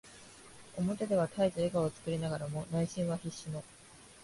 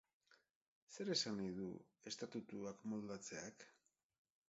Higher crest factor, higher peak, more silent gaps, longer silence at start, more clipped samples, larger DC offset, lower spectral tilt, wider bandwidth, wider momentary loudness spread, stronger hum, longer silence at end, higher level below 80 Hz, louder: about the same, 18 dB vs 22 dB; first, -18 dBFS vs -28 dBFS; second, none vs 0.56-0.87 s; second, 0.05 s vs 0.3 s; neither; neither; first, -6.5 dB/octave vs -4 dB/octave; first, 11.5 kHz vs 7.6 kHz; first, 21 LU vs 16 LU; neither; second, 0 s vs 0.75 s; first, -64 dBFS vs -82 dBFS; first, -35 LUFS vs -47 LUFS